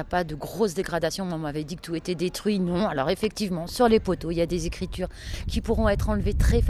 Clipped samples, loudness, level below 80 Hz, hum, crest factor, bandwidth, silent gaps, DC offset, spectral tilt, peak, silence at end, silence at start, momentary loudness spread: under 0.1%; -26 LUFS; -32 dBFS; none; 18 dB; 14 kHz; none; under 0.1%; -6 dB/octave; -8 dBFS; 0 s; 0 s; 9 LU